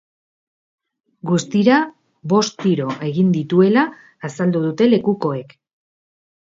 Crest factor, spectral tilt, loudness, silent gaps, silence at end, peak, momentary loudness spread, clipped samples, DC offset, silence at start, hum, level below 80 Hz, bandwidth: 18 dB; -6.5 dB/octave; -18 LUFS; none; 1.05 s; -2 dBFS; 14 LU; under 0.1%; under 0.1%; 1.25 s; none; -64 dBFS; 7.8 kHz